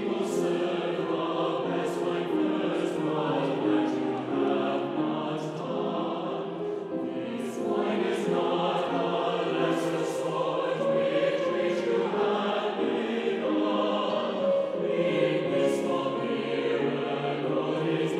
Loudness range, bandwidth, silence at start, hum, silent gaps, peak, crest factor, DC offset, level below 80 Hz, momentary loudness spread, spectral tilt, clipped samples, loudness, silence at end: 3 LU; 13.5 kHz; 0 s; none; none; -12 dBFS; 16 dB; under 0.1%; -76 dBFS; 5 LU; -6 dB/octave; under 0.1%; -28 LUFS; 0 s